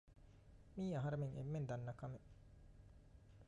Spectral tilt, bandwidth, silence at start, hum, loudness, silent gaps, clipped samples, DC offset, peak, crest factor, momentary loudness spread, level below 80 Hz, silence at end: -8.5 dB/octave; 8.8 kHz; 0.05 s; none; -47 LUFS; none; under 0.1%; under 0.1%; -34 dBFS; 14 dB; 23 LU; -66 dBFS; 0 s